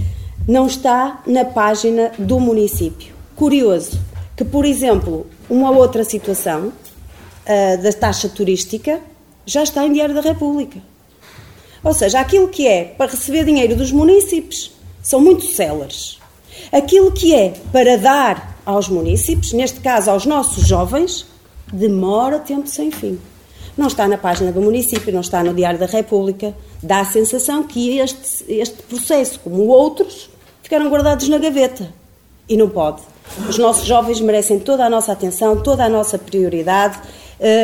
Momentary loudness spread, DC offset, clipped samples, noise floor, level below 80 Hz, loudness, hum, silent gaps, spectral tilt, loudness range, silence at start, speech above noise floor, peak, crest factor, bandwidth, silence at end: 13 LU; 0.1%; under 0.1%; -43 dBFS; -32 dBFS; -15 LUFS; none; none; -4.5 dB/octave; 4 LU; 0 s; 28 dB; 0 dBFS; 14 dB; 19 kHz; 0 s